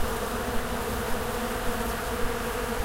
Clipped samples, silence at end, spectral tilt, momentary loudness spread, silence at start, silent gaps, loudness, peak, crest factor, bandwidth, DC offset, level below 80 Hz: under 0.1%; 0 s; -4 dB/octave; 0 LU; 0 s; none; -30 LUFS; -14 dBFS; 14 dB; 16 kHz; under 0.1%; -36 dBFS